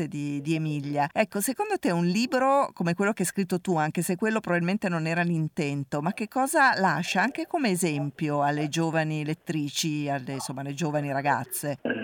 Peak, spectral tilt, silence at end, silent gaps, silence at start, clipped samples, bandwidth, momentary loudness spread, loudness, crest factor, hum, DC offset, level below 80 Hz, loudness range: -10 dBFS; -5 dB/octave; 0 s; none; 0 s; under 0.1%; 19 kHz; 7 LU; -27 LUFS; 18 dB; none; under 0.1%; -70 dBFS; 3 LU